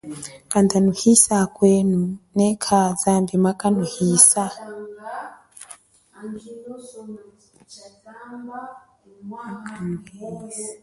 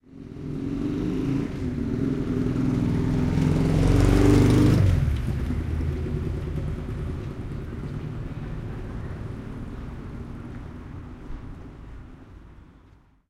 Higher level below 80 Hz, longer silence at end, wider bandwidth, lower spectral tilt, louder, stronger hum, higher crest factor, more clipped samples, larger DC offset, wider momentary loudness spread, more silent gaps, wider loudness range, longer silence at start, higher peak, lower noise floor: second, -58 dBFS vs -32 dBFS; second, 0.05 s vs 0.6 s; second, 12 kHz vs 15 kHz; second, -4.5 dB/octave vs -8 dB/octave; first, -18 LUFS vs -25 LUFS; neither; about the same, 22 dB vs 18 dB; neither; neither; first, 25 LU vs 22 LU; neither; first, 21 LU vs 17 LU; about the same, 0.05 s vs 0.1 s; first, 0 dBFS vs -6 dBFS; second, -47 dBFS vs -55 dBFS